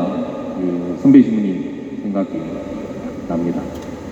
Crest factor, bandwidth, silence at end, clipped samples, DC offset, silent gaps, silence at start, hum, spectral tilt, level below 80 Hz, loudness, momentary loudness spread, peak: 18 dB; 7.8 kHz; 0 s; under 0.1%; under 0.1%; none; 0 s; none; -8.5 dB/octave; -48 dBFS; -19 LUFS; 16 LU; 0 dBFS